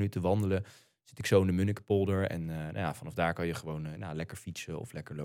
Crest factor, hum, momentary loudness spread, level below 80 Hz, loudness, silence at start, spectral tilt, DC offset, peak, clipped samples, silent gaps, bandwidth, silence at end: 20 dB; none; 13 LU; -58 dBFS; -33 LUFS; 0 s; -6.5 dB/octave; under 0.1%; -12 dBFS; under 0.1%; none; 16 kHz; 0 s